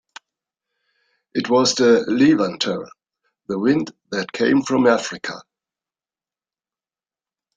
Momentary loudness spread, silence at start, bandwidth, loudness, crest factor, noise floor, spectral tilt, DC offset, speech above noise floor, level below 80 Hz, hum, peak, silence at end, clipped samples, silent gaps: 14 LU; 1.35 s; 9.4 kHz; -19 LUFS; 18 dB; under -90 dBFS; -4.5 dB/octave; under 0.1%; over 72 dB; -64 dBFS; none; -4 dBFS; 2.15 s; under 0.1%; none